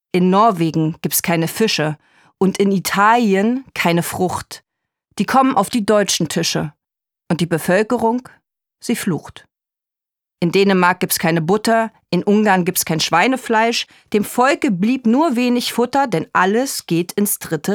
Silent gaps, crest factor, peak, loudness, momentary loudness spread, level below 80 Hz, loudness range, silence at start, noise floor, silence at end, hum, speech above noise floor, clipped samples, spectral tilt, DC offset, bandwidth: none; 16 dB; -2 dBFS; -17 LUFS; 9 LU; -58 dBFS; 4 LU; 0.15 s; -87 dBFS; 0 s; none; 70 dB; under 0.1%; -4.5 dB/octave; under 0.1%; 20 kHz